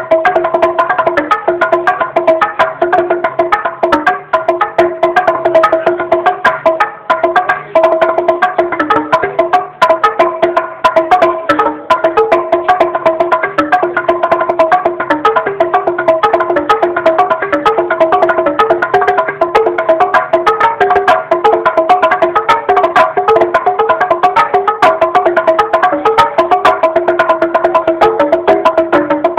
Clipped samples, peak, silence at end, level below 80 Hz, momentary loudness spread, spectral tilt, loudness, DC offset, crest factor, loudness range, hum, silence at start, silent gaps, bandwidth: 0.6%; 0 dBFS; 0 s; -48 dBFS; 3 LU; -5 dB/octave; -11 LUFS; under 0.1%; 10 dB; 2 LU; none; 0 s; none; 10.5 kHz